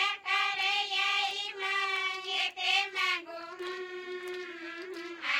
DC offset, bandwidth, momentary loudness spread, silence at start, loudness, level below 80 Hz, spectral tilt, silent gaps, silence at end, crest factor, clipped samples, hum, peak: under 0.1%; 16.5 kHz; 13 LU; 0 s; -30 LUFS; -84 dBFS; 0.5 dB/octave; none; 0 s; 18 dB; under 0.1%; none; -14 dBFS